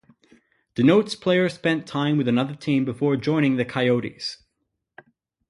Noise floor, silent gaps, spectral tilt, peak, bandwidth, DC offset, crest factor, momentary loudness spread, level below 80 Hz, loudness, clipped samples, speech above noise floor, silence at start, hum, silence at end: -77 dBFS; none; -6.5 dB/octave; -4 dBFS; 11.5 kHz; under 0.1%; 18 dB; 8 LU; -62 dBFS; -22 LUFS; under 0.1%; 56 dB; 0.75 s; none; 1.15 s